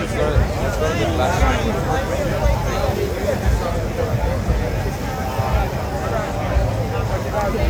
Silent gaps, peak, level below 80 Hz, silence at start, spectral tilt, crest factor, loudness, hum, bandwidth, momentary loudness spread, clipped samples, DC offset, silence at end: none; -2 dBFS; -24 dBFS; 0 s; -6 dB/octave; 16 dB; -21 LUFS; none; 17.5 kHz; 4 LU; under 0.1%; under 0.1%; 0 s